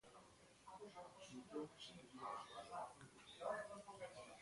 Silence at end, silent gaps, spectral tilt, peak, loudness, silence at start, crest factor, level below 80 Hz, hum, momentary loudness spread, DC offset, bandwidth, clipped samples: 0 s; none; -4 dB/octave; -34 dBFS; -54 LUFS; 0.05 s; 20 dB; -82 dBFS; none; 13 LU; under 0.1%; 11.5 kHz; under 0.1%